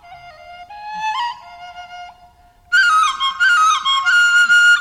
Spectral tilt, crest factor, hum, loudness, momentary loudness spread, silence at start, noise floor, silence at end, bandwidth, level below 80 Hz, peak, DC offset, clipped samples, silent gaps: 2.5 dB/octave; 14 dB; none; -13 LUFS; 24 LU; 0.1 s; -48 dBFS; 0 s; 13.5 kHz; -56 dBFS; -4 dBFS; under 0.1%; under 0.1%; none